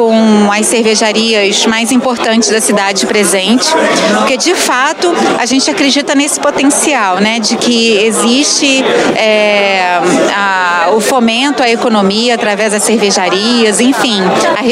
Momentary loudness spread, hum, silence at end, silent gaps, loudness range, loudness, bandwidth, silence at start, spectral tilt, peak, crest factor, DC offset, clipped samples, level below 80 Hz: 2 LU; none; 0 s; none; 1 LU; -9 LUFS; 16 kHz; 0 s; -2.5 dB/octave; 0 dBFS; 10 dB; under 0.1%; under 0.1%; -56 dBFS